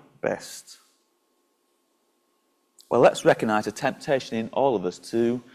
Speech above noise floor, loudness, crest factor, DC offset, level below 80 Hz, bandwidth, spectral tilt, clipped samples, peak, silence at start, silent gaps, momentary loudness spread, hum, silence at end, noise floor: 46 dB; -24 LUFS; 22 dB; under 0.1%; -66 dBFS; 15 kHz; -5 dB/octave; under 0.1%; -4 dBFS; 0.25 s; none; 11 LU; none; 0.15 s; -70 dBFS